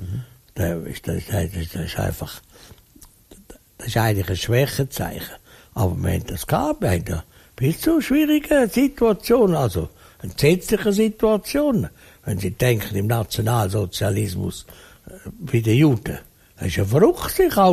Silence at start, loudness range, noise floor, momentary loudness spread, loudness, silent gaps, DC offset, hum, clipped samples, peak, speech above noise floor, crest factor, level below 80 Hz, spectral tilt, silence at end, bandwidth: 0 s; 7 LU; -50 dBFS; 16 LU; -21 LUFS; none; under 0.1%; none; under 0.1%; -4 dBFS; 29 dB; 18 dB; -40 dBFS; -6 dB/octave; 0 s; 15.5 kHz